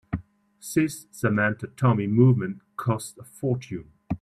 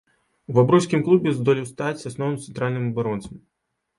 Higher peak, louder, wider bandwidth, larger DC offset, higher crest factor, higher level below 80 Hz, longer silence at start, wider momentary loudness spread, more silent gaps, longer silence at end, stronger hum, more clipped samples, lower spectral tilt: about the same, -6 dBFS vs -4 dBFS; second, -25 LUFS vs -22 LUFS; first, 14 kHz vs 11.5 kHz; neither; about the same, 18 dB vs 20 dB; about the same, -54 dBFS vs -58 dBFS; second, 0.1 s vs 0.5 s; first, 16 LU vs 11 LU; neither; second, 0.05 s vs 0.6 s; neither; neither; about the same, -7 dB/octave vs -7 dB/octave